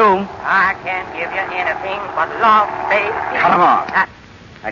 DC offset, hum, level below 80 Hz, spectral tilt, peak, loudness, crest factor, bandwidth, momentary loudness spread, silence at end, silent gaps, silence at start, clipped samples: under 0.1%; none; -50 dBFS; -5.5 dB/octave; -2 dBFS; -16 LUFS; 14 dB; 7.4 kHz; 10 LU; 0 s; none; 0 s; under 0.1%